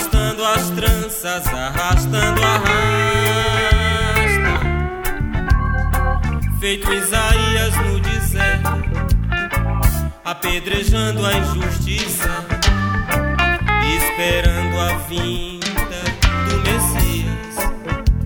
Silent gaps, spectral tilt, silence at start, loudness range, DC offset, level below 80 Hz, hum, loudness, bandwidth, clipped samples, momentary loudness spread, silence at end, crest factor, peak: none; -4 dB/octave; 0 s; 3 LU; under 0.1%; -22 dBFS; none; -18 LUFS; over 20 kHz; under 0.1%; 7 LU; 0 s; 18 dB; 0 dBFS